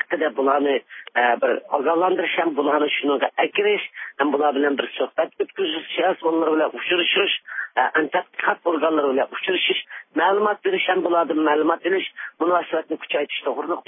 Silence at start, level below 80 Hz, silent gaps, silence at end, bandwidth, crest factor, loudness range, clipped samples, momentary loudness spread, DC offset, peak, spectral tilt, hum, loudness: 0.1 s; -86 dBFS; none; 0.05 s; 3.8 kHz; 18 dB; 1 LU; under 0.1%; 6 LU; under 0.1%; -4 dBFS; -8 dB/octave; none; -21 LUFS